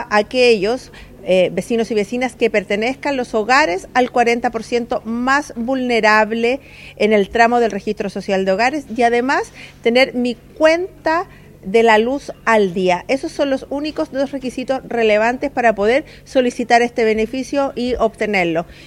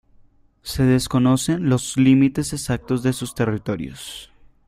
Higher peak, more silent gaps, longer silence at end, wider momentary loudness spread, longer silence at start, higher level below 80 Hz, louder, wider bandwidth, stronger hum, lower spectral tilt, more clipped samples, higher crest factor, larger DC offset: first, 0 dBFS vs -4 dBFS; neither; second, 0 s vs 0.4 s; second, 8 LU vs 16 LU; second, 0 s vs 0.65 s; about the same, -46 dBFS vs -44 dBFS; first, -17 LUFS vs -20 LUFS; second, 13.5 kHz vs 15.5 kHz; neither; second, -4.5 dB/octave vs -6 dB/octave; neither; about the same, 16 dB vs 16 dB; neither